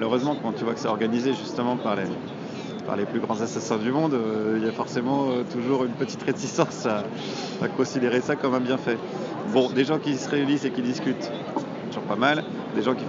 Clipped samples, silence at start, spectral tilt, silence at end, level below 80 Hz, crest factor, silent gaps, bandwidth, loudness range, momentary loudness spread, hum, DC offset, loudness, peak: under 0.1%; 0 s; -5.5 dB/octave; 0 s; -72 dBFS; 20 dB; none; 7.6 kHz; 2 LU; 8 LU; none; under 0.1%; -26 LUFS; -4 dBFS